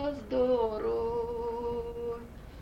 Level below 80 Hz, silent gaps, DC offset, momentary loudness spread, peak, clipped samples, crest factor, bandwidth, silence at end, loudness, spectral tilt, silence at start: -48 dBFS; none; under 0.1%; 11 LU; -18 dBFS; under 0.1%; 14 dB; 8 kHz; 0 s; -32 LUFS; -7.5 dB/octave; 0 s